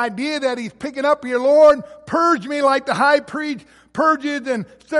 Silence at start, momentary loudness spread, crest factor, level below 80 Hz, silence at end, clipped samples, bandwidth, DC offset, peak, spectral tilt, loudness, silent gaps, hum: 0 s; 14 LU; 16 dB; -60 dBFS; 0 s; under 0.1%; 11.5 kHz; under 0.1%; -2 dBFS; -4.5 dB/octave; -18 LUFS; none; none